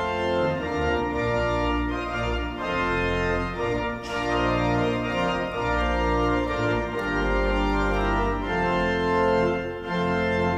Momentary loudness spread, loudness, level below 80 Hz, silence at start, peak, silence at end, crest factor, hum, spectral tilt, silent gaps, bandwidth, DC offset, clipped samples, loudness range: 4 LU; -25 LUFS; -34 dBFS; 0 s; -10 dBFS; 0 s; 14 dB; none; -6.5 dB/octave; none; 10 kHz; under 0.1%; under 0.1%; 2 LU